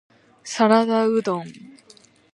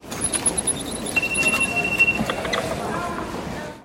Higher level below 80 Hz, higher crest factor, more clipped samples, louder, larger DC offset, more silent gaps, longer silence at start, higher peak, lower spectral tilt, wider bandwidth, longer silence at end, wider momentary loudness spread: second, -74 dBFS vs -44 dBFS; about the same, 20 dB vs 16 dB; neither; about the same, -20 LUFS vs -21 LUFS; neither; neither; first, 0.45 s vs 0 s; first, -2 dBFS vs -8 dBFS; first, -5 dB/octave vs -2.5 dB/octave; second, 11 kHz vs 16.5 kHz; first, 0.75 s vs 0 s; first, 20 LU vs 11 LU